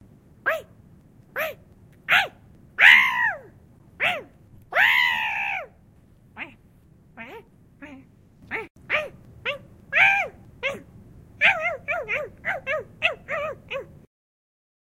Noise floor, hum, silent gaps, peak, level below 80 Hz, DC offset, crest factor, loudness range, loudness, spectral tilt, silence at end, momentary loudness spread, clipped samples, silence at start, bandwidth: -54 dBFS; none; 8.70-8.75 s; -2 dBFS; -58 dBFS; under 0.1%; 24 dB; 14 LU; -22 LUFS; -2 dB/octave; 1.05 s; 21 LU; under 0.1%; 0.45 s; 16 kHz